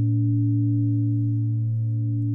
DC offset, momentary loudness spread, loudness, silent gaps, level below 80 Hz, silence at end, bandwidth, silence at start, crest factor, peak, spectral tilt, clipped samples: under 0.1%; 3 LU; -23 LUFS; none; -60 dBFS; 0 s; 0.6 kHz; 0 s; 8 dB; -14 dBFS; -14.5 dB/octave; under 0.1%